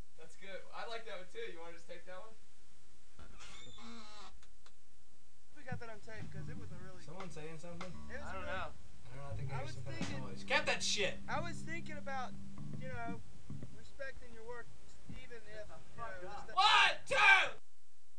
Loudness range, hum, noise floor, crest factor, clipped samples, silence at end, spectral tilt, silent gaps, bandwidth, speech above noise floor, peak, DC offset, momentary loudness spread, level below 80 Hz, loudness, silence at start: 21 LU; none; -74 dBFS; 26 dB; under 0.1%; 0.6 s; -3 dB/octave; none; 11 kHz; 36 dB; -14 dBFS; 1%; 25 LU; -62 dBFS; -35 LUFS; 0.2 s